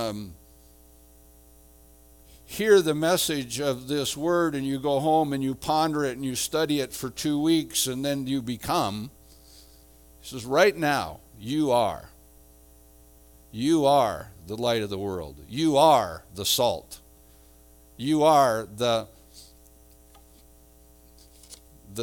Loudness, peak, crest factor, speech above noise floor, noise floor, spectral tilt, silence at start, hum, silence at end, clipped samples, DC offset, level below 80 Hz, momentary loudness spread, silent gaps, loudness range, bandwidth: -25 LUFS; -4 dBFS; 22 dB; 30 dB; -54 dBFS; -4 dB/octave; 0 s; none; 0 s; under 0.1%; under 0.1%; -54 dBFS; 18 LU; none; 4 LU; 19.5 kHz